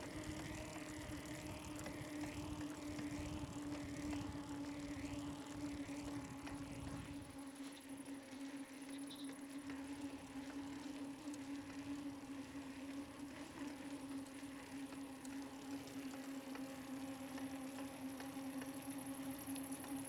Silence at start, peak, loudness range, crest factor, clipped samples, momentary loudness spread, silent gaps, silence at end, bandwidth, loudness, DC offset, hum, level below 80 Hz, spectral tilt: 0 s; -32 dBFS; 3 LU; 18 dB; under 0.1%; 4 LU; none; 0 s; 18.5 kHz; -49 LUFS; under 0.1%; none; -66 dBFS; -4.5 dB/octave